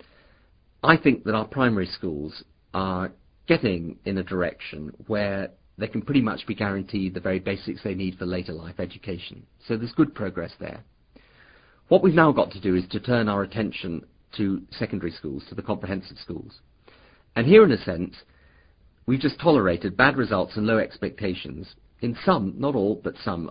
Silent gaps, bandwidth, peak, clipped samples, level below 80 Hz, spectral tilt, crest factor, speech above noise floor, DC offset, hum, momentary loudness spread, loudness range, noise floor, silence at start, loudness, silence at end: none; 5.2 kHz; 0 dBFS; under 0.1%; -50 dBFS; -11 dB/octave; 24 dB; 35 dB; under 0.1%; none; 17 LU; 8 LU; -59 dBFS; 0.85 s; -24 LUFS; 0 s